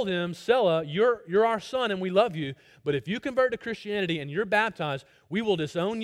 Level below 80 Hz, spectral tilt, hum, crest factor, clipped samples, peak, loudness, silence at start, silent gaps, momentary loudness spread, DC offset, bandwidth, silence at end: -64 dBFS; -6 dB/octave; none; 18 dB; under 0.1%; -8 dBFS; -27 LUFS; 0 s; none; 9 LU; under 0.1%; 13 kHz; 0 s